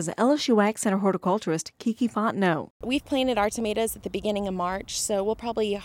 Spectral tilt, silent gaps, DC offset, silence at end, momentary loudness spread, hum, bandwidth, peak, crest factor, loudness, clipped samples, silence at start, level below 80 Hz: -4.5 dB/octave; 2.70-2.80 s; under 0.1%; 0 s; 7 LU; none; 17 kHz; -10 dBFS; 16 dB; -26 LUFS; under 0.1%; 0 s; -52 dBFS